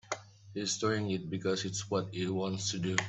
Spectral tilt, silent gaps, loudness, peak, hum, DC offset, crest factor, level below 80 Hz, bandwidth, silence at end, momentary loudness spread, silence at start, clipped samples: -4 dB/octave; none; -34 LUFS; -12 dBFS; none; under 0.1%; 22 dB; -68 dBFS; 8.4 kHz; 0 s; 8 LU; 0.05 s; under 0.1%